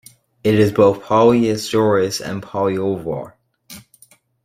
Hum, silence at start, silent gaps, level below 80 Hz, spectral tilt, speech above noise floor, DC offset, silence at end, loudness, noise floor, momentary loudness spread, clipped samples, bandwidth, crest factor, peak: none; 0.45 s; none; -54 dBFS; -6 dB/octave; 36 dB; under 0.1%; 0.65 s; -17 LUFS; -52 dBFS; 12 LU; under 0.1%; 16 kHz; 16 dB; -2 dBFS